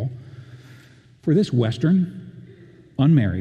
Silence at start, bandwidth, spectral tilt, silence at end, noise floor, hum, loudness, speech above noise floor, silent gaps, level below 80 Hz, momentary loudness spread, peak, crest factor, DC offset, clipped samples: 0 s; 9 kHz; -8.5 dB/octave; 0 s; -49 dBFS; none; -20 LUFS; 31 dB; none; -58 dBFS; 24 LU; -6 dBFS; 16 dB; under 0.1%; under 0.1%